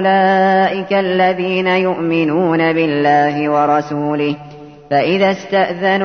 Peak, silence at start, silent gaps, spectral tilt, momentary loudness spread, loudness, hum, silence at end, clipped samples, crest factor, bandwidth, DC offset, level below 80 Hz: -2 dBFS; 0 s; none; -7 dB/octave; 6 LU; -14 LUFS; none; 0 s; under 0.1%; 12 dB; 6.6 kHz; 0.1%; -58 dBFS